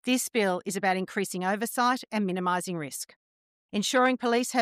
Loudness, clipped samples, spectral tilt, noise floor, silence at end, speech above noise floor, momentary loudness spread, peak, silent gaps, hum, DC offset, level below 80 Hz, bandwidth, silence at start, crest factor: -27 LUFS; under 0.1%; -3.5 dB/octave; under -90 dBFS; 0 s; over 63 dB; 10 LU; -12 dBFS; 3.16-3.69 s; none; under 0.1%; -80 dBFS; 15.5 kHz; 0.05 s; 14 dB